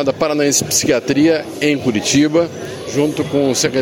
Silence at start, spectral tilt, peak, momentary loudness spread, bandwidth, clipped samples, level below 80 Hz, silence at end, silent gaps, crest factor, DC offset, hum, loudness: 0 s; -3.5 dB/octave; -2 dBFS; 5 LU; 16.5 kHz; under 0.1%; -50 dBFS; 0 s; none; 14 dB; under 0.1%; none; -15 LUFS